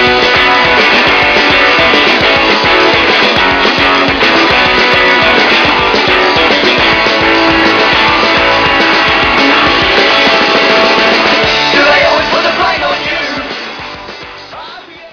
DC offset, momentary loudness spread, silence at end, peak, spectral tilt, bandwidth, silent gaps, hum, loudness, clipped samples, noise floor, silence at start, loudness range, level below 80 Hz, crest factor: under 0.1%; 9 LU; 0.05 s; 0 dBFS; -3.5 dB/octave; 5.4 kHz; none; none; -7 LUFS; under 0.1%; -29 dBFS; 0 s; 3 LU; -34 dBFS; 8 dB